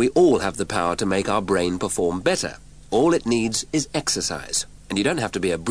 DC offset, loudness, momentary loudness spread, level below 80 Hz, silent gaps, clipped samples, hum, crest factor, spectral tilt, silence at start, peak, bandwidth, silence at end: 0.4%; -22 LUFS; 6 LU; -48 dBFS; none; under 0.1%; none; 16 dB; -4 dB/octave; 0 s; -6 dBFS; 11 kHz; 0 s